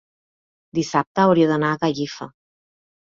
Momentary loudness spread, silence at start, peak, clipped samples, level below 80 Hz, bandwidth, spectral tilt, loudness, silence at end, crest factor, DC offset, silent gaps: 15 LU; 0.75 s; -4 dBFS; under 0.1%; -60 dBFS; 7.6 kHz; -6 dB/octave; -20 LUFS; 0.75 s; 18 dB; under 0.1%; 1.07-1.15 s